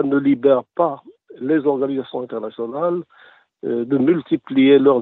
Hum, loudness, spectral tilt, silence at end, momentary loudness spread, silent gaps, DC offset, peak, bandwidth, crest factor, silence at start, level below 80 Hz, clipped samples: none; -19 LUFS; -10 dB/octave; 0 s; 14 LU; none; under 0.1%; -2 dBFS; 4 kHz; 16 dB; 0 s; -68 dBFS; under 0.1%